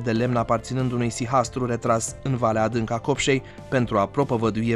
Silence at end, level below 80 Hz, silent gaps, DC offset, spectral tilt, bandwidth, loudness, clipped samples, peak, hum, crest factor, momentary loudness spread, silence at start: 0 s; -46 dBFS; none; under 0.1%; -5.5 dB/octave; 12.5 kHz; -24 LUFS; under 0.1%; -6 dBFS; none; 16 dB; 4 LU; 0 s